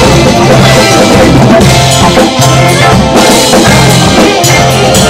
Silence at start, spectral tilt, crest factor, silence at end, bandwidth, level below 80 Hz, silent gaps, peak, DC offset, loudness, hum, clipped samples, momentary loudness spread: 0 s; -4.5 dB/octave; 4 dB; 0 s; 16.5 kHz; -20 dBFS; none; 0 dBFS; under 0.1%; -3 LUFS; none; 4%; 2 LU